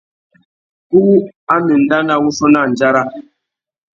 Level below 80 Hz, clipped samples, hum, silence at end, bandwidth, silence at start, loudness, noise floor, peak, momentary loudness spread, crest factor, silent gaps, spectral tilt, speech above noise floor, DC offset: -56 dBFS; under 0.1%; none; 0.75 s; 7.4 kHz; 0.9 s; -13 LUFS; -77 dBFS; 0 dBFS; 5 LU; 14 dB; 1.36-1.47 s; -6 dB/octave; 66 dB; under 0.1%